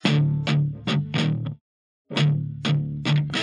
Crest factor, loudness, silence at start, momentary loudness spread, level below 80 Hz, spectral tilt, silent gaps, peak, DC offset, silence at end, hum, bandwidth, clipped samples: 18 dB; -24 LUFS; 0.05 s; 8 LU; -54 dBFS; -6.5 dB/octave; 1.61-2.05 s; -6 dBFS; under 0.1%; 0 s; none; 9.4 kHz; under 0.1%